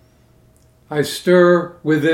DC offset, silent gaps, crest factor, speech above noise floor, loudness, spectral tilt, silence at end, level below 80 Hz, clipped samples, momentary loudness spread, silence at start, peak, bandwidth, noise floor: under 0.1%; none; 16 dB; 37 dB; -16 LUFS; -6 dB/octave; 0 s; -58 dBFS; under 0.1%; 10 LU; 0.9 s; 0 dBFS; 16 kHz; -52 dBFS